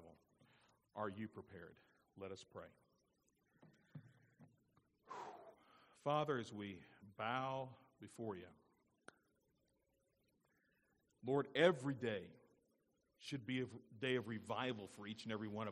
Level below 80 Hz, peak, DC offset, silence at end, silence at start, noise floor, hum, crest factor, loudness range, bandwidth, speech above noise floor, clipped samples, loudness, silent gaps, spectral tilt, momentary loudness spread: -86 dBFS; -20 dBFS; under 0.1%; 0 s; 0 s; -83 dBFS; none; 28 dB; 17 LU; 13 kHz; 39 dB; under 0.1%; -44 LUFS; none; -6 dB/octave; 21 LU